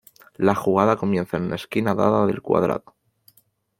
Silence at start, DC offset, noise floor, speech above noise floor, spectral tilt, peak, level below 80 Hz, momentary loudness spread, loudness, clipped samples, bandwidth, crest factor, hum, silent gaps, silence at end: 0.4 s; under 0.1%; -62 dBFS; 41 dB; -7.5 dB/octave; -2 dBFS; -58 dBFS; 7 LU; -22 LUFS; under 0.1%; 16.5 kHz; 20 dB; none; none; 1 s